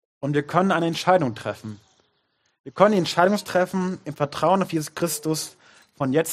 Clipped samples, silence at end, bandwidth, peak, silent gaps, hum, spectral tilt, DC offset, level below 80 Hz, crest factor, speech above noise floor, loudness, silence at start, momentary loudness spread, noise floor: under 0.1%; 0 s; 15.5 kHz; -2 dBFS; 2.59-2.64 s; none; -5 dB/octave; under 0.1%; -66 dBFS; 22 dB; 48 dB; -23 LUFS; 0.2 s; 12 LU; -70 dBFS